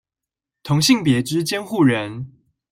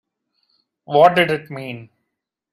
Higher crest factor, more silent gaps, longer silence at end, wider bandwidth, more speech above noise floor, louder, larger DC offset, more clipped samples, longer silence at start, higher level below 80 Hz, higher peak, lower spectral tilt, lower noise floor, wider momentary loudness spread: about the same, 18 dB vs 20 dB; neither; second, 0.45 s vs 0.7 s; first, 16.5 kHz vs 14 kHz; first, 69 dB vs 63 dB; about the same, -18 LUFS vs -16 LUFS; neither; neither; second, 0.65 s vs 0.9 s; first, -56 dBFS vs -64 dBFS; about the same, -4 dBFS vs -2 dBFS; about the same, -5 dB/octave vs -6 dB/octave; first, -87 dBFS vs -79 dBFS; about the same, 19 LU vs 19 LU